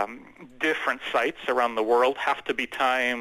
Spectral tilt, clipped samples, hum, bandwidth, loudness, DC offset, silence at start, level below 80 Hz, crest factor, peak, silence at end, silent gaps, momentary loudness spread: -3 dB/octave; under 0.1%; none; 14 kHz; -25 LUFS; under 0.1%; 0 s; -64 dBFS; 14 dB; -10 dBFS; 0 s; none; 6 LU